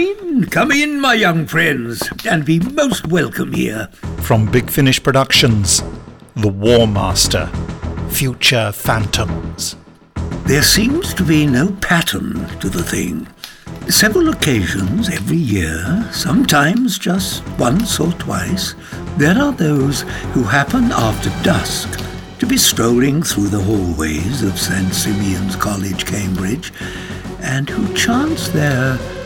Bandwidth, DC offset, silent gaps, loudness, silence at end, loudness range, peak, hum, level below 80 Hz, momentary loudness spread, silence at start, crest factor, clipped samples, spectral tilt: 19.5 kHz; under 0.1%; none; -15 LUFS; 0 s; 4 LU; 0 dBFS; none; -32 dBFS; 12 LU; 0 s; 14 dB; under 0.1%; -4 dB/octave